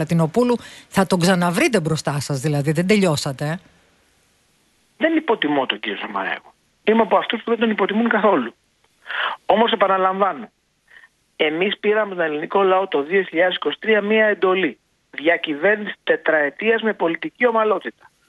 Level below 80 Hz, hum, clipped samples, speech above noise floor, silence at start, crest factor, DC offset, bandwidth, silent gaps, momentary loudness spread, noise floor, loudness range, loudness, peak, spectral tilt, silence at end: -60 dBFS; none; under 0.1%; 42 dB; 0 s; 18 dB; under 0.1%; 12 kHz; none; 8 LU; -61 dBFS; 3 LU; -19 LUFS; -2 dBFS; -5.5 dB/octave; 0.4 s